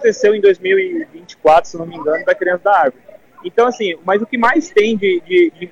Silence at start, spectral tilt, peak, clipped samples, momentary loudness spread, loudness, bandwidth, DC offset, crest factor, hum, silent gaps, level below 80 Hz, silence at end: 0 s; -4.5 dB/octave; -2 dBFS; under 0.1%; 9 LU; -14 LUFS; 7.8 kHz; under 0.1%; 12 dB; none; none; -54 dBFS; 0.05 s